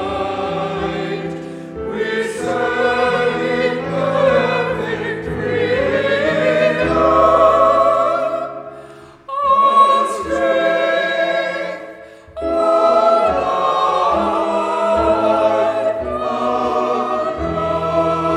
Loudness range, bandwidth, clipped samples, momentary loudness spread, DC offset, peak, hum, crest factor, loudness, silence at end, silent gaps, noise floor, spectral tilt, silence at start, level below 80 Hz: 3 LU; 11 kHz; under 0.1%; 12 LU; under 0.1%; 0 dBFS; none; 16 dB; -16 LUFS; 0 s; none; -39 dBFS; -5.5 dB/octave; 0 s; -42 dBFS